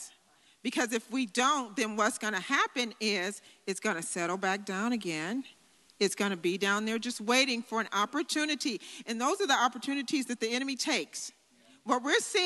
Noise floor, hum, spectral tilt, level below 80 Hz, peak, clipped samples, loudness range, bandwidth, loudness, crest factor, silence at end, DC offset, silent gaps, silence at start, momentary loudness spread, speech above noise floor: -65 dBFS; none; -2.5 dB/octave; -88 dBFS; -10 dBFS; under 0.1%; 3 LU; 12.5 kHz; -31 LUFS; 22 dB; 0 s; under 0.1%; none; 0 s; 10 LU; 33 dB